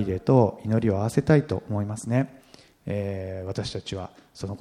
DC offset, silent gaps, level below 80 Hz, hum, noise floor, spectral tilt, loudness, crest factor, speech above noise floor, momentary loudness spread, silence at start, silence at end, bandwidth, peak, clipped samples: under 0.1%; none; -52 dBFS; none; -53 dBFS; -7.5 dB/octave; -25 LUFS; 20 dB; 28 dB; 15 LU; 0 s; 0.05 s; 13.5 kHz; -4 dBFS; under 0.1%